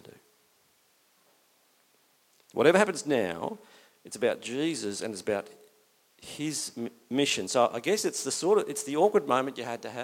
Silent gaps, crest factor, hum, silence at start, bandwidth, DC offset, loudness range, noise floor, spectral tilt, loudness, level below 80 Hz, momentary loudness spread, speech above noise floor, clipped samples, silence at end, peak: none; 24 dB; none; 2.55 s; 16.5 kHz; under 0.1%; 6 LU; -67 dBFS; -3.5 dB/octave; -28 LUFS; -74 dBFS; 14 LU; 39 dB; under 0.1%; 0 s; -6 dBFS